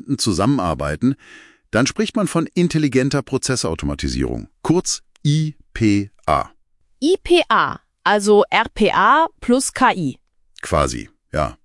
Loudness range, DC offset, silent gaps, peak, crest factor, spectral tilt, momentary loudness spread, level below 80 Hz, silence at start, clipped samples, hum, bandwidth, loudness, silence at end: 5 LU; under 0.1%; none; 0 dBFS; 18 dB; -5 dB/octave; 9 LU; -38 dBFS; 0.05 s; under 0.1%; none; 12 kHz; -18 LUFS; 0.1 s